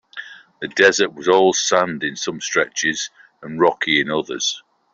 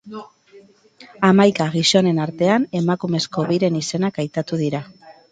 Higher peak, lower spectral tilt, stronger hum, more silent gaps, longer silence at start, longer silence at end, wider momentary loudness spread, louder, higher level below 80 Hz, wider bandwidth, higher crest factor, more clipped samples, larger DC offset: about the same, -2 dBFS vs 0 dBFS; second, -2.5 dB/octave vs -5.5 dB/octave; neither; neither; about the same, 0.15 s vs 0.05 s; first, 0.35 s vs 0.2 s; first, 16 LU vs 10 LU; about the same, -18 LUFS vs -19 LUFS; about the same, -64 dBFS vs -62 dBFS; second, 7.8 kHz vs 9.4 kHz; about the same, 18 dB vs 18 dB; neither; neither